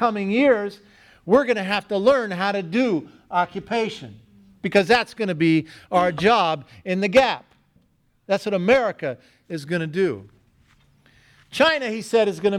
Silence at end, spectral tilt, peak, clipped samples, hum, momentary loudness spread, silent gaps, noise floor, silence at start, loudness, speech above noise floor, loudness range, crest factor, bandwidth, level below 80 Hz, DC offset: 0 s; -5.5 dB/octave; -2 dBFS; under 0.1%; none; 13 LU; none; -63 dBFS; 0 s; -21 LUFS; 42 dB; 4 LU; 20 dB; 13 kHz; -58 dBFS; under 0.1%